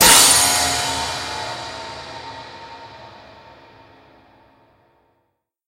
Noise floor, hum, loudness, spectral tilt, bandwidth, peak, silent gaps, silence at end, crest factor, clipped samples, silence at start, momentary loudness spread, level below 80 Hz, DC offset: -71 dBFS; none; -15 LUFS; 0 dB/octave; 16 kHz; 0 dBFS; none; 2.55 s; 22 dB; under 0.1%; 0 s; 28 LU; -46 dBFS; under 0.1%